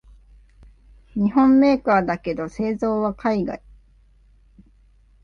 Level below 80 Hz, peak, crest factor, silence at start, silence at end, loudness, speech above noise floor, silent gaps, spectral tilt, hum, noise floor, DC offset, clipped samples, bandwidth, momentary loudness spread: -48 dBFS; -6 dBFS; 16 dB; 1.15 s; 1.7 s; -20 LUFS; 35 dB; none; -8 dB/octave; none; -54 dBFS; under 0.1%; under 0.1%; 6.8 kHz; 13 LU